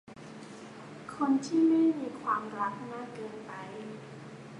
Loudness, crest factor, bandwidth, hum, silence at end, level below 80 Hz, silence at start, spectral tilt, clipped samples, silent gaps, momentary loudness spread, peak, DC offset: -31 LUFS; 16 dB; 10.5 kHz; none; 0 s; -74 dBFS; 0.05 s; -6 dB/octave; under 0.1%; none; 21 LU; -16 dBFS; under 0.1%